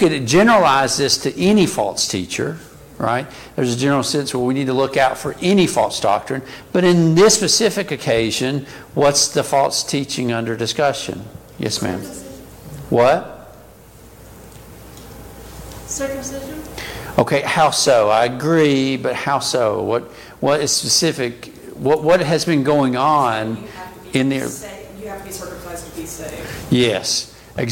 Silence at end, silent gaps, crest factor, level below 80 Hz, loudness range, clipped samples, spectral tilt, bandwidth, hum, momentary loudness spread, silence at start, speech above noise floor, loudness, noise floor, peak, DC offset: 0 s; none; 18 dB; -46 dBFS; 8 LU; under 0.1%; -4 dB/octave; 17 kHz; none; 18 LU; 0 s; 25 dB; -17 LUFS; -43 dBFS; -2 dBFS; under 0.1%